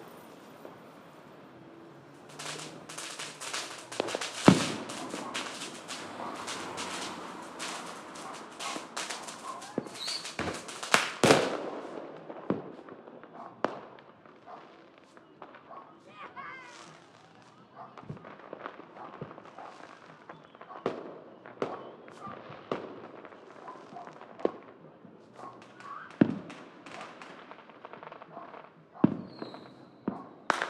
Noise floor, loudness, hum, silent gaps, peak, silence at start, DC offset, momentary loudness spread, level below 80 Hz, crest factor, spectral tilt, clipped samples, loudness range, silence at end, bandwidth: -56 dBFS; -34 LUFS; none; none; -2 dBFS; 0 s; under 0.1%; 23 LU; -74 dBFS; 34 dB; -4 dB/octave; under 0.1%; 17 LU; 0 s; 15.5 kHz